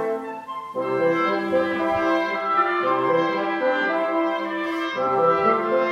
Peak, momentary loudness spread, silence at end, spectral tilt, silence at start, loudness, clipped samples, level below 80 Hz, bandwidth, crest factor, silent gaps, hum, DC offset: -8 dBFS; 7 LU; 0 s; -6 dB/octave; 0 s; -22 LUFS; under 0.1%; -62 dBFS; 10.5 kHz; 14 dB; none; none; under 0.1%